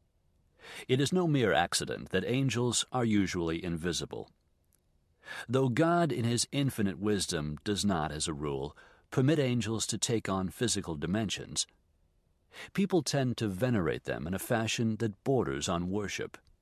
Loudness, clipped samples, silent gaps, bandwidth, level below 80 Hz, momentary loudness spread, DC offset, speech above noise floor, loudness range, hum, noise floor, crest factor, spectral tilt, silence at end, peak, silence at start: -31 LUFS; under 0.1%; none; 14 kHz; -54 dBFS; 9 LU; under 0.1%; 40 dB; 3 LU; none; -71 dBFS; 20 dB; -4.5 dB/octave; 0.3 s; -12 dBFS; 0.65 s